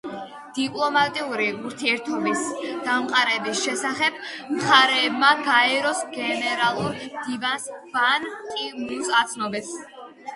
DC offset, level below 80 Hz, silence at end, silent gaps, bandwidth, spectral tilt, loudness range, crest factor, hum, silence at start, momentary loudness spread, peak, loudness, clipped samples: under 0.1%; -68 dBFS; 0 s; none; 11.5 kHz; -2 dB/octave; 5 LU; 22 dB; none; 0.05 s; 13 LU; -2 dBFS; -22 LUFS; under 0.1%